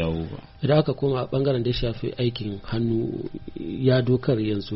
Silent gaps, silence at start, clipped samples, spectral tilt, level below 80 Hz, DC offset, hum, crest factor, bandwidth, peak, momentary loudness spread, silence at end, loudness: none; 0 s; under 0.1%; -6.5 dB/octave; -42 dBFS; under 0.1%; none; 16 dB; 5.8 kHz; -8 dBFS; 12 LU; 0 s; -24 LUFS